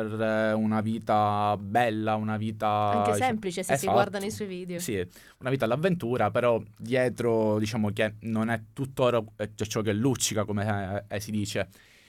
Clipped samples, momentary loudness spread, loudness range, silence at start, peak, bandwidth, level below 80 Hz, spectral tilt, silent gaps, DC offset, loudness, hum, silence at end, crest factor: under 0.1%; 9 LU; 2 LU; 0 s; -10 dBFS; 17 kHz; -62 dBFS; -5.5 dB/octave; none; under 0.1%; -28 LUFS; none; 0.4 s; 18 dB